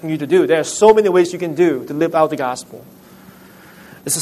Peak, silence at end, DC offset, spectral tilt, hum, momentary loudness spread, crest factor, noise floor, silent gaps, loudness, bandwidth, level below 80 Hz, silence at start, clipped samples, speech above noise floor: 0 dBFS; 0 s; under 0.1%; -4.5 dB/octave; none; 13 LU; 16 dB; -42 dBFS; none; -15 LUFS; 13.5 kHz; -58 dBFS; 0.05 s; under 0.1%; 27 dB